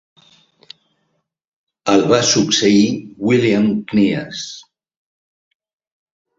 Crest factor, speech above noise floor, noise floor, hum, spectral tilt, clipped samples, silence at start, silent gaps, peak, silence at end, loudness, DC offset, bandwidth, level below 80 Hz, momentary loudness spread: 18 dB; 54 dB; -69 dBFS; none; -4 dB/octave; under 0.1%; 1.85 s; none; -2 dBFS; 1.8 s; -15 LUFS; under 0.1%; 8 kHz; -56 dBFS; 14 LU